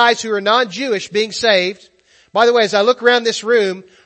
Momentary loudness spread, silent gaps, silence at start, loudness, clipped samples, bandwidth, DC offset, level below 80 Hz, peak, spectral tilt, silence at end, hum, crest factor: 7 LU; none; 0 s; -15 LUFS; under 0.1%; 8.6 kHz; under 0.1%; -64 dBFS; 0 dBFS; -2.5 dB/octave; 0.25 s; none; 16 dB